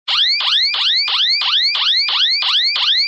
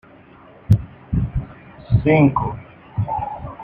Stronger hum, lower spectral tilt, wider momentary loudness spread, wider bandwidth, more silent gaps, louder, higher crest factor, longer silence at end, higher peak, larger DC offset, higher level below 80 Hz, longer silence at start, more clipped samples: neither; second, 3 dB/octave vs -10 dB/octave; second, 1 LU vs 15 LU; first, 9 kHz vs 5.2 kHz; neither; first, -12 LUFS vs -20 LUFS; second, 10 dB vs 18 dB; about the same, 0 s vs 0 s; second, -6 dBFS vs -2 dBFS; neither; second, -62 dBFS vs -34 dBFS; second, 0.05 s vs 0.7 s; neither